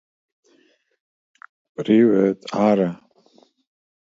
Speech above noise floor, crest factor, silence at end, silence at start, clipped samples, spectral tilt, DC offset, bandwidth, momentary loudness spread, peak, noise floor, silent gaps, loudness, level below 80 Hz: 43 dB; 18 dB; 1.1 s; 1.8 s; under 0.1%; -8 dB/octave; under 0.1%; 7.6 kHz; 19 LU; -4 dBFS; -61 dBFS; none; -19 LUFS; -66 dBFS